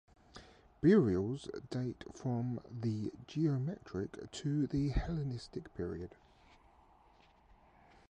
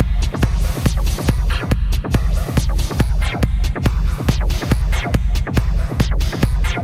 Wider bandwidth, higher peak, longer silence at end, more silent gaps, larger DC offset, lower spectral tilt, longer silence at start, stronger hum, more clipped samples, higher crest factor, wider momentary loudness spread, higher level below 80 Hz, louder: second, 9.6 kHz vs 15.5 kHz; second, -16 dBFS vs 0 dBFS; first, 2 s vs 0 s; neither; neither; first, -8 dB/octave vs -6 dB/octave; first, 0.35 s vs 0 s; neither; neither; about the same, 20 dB vs 16 dB; first, 16 LU vs 1 LU; second, -52 dBFS vs -18 dBFS; second, -37 LUFS vs -19 LUFS